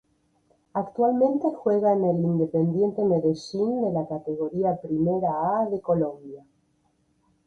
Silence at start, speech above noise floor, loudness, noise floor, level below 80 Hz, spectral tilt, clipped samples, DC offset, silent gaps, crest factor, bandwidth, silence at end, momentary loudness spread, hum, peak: 0.75 s; 44 dB; -25 LUFS; -68 dBFS; -62 dBFS; -9 dB/octave; under 0.1%; under 0.1%; none; 16 dB; 7.8 kHz; 1.1 s; 9 LU; none; -10 dBFS